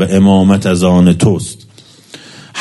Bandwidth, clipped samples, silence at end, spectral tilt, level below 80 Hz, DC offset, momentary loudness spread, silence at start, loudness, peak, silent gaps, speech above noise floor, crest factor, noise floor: 12 kHz; under 0.1%; 0 s; -6.5 dB/octave; -42 dBFS; under 0.1%; 14 LU; 0 s; -10 LUFS; 0 dBFS; none; 28 dB; 10 dB; -38 dBFS